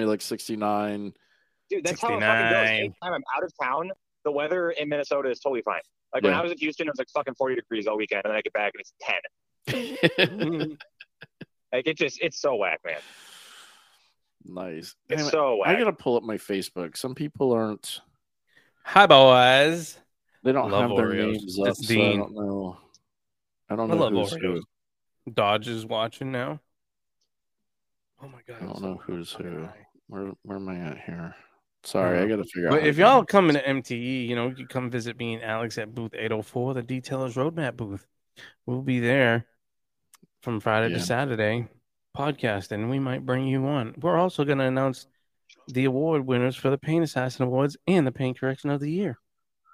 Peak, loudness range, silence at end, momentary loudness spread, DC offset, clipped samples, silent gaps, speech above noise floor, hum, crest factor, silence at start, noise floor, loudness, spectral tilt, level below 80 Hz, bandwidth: 0 dBFS; 11 LU; 0.6 s; 16 LU; under 0.1%; under 0.1%; none; 63 dB; none; 26 dB; 0 s; -88 dBFS; -25 LUFS; -5.5 dB/octave; -66 dBFS; 15.5 kHz